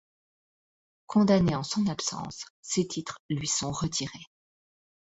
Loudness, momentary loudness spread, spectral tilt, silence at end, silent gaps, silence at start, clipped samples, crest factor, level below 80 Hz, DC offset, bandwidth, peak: -28 LUFS; 15 LU; -4.5 dB/octave; 0.85 s; 2.50-2.63 s, 3.19-3.29 s; 1.1 s; under 0.1%; 20 dB; -56 dBFS; under 0.1%; 8.2 kHz; -10 dBFS